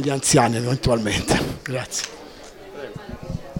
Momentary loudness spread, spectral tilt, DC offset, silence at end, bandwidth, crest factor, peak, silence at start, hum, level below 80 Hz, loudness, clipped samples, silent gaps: 22 LU; -4 dB/octave; under 0.1%; 0 s; 17 kHz; 20 dB; -4 dBFS; 0 s; none; -40 dBFS; -21 LUFS; under 0.1%; none